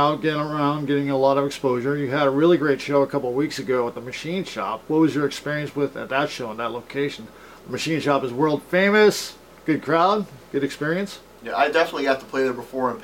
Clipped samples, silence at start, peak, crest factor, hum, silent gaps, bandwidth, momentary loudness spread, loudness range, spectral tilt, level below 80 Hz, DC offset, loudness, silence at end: under 0.1%; 0 s; -4 dBFS; 18 dB; none; none; 17 kHz; 10 LU; 4 LU; -5.5 dB/octave; -60 dBFS; under 0.1%; -22 LUFS; 0 s